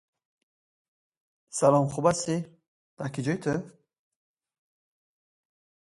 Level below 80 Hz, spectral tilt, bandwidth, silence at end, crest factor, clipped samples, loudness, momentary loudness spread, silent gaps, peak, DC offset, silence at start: -66 dBFS; -5.5 dB/octave; 11.5 kHz; 2.25 s; 24 dB; under 0.1%; -27 LUFS; 15 LU; 2.68-2.97 s; -8 dBFS; under 0.1%; 1.55 s